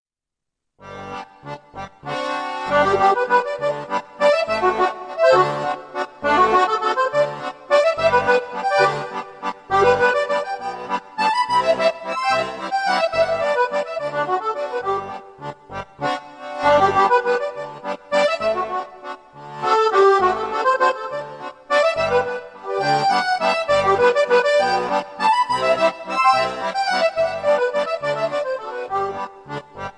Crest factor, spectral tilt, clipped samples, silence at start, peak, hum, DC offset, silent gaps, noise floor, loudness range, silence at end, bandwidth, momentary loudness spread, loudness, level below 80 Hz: 16 dB; -4 dB/octave; under 0.1%; 0.8 s; -4 dBFS; none; under 0.1%; none; -84 dBFS; 4 LU; 0.05 s; 10.5 kHz; 15 LU; -19 LUFS; -56 dBFS